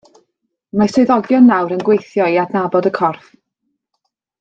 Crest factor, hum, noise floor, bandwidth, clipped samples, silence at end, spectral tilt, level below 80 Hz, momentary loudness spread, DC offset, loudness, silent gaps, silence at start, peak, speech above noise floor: 16 dB; none; -72 dBFS; 7.8 kHz; under 0.1%; 1.25 s; -7 dB/octave; -58 dBFS; 8 LU; under 0.1%; -14 LUFS; none; 0.75 s; 0 dBFS; 59 dB